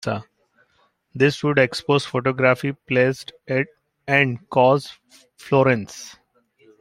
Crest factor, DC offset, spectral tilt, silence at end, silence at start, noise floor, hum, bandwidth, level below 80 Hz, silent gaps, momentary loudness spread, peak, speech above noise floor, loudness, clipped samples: 20 dB; under 0.1%; -6 dB/octave; 0.7 s; 0.05 s; -64 dBFS; none; 15 kHz; -60 dBFS; none; 17 LU; -2 dBFS; 44 dB; -20 LUFS; under 0.1%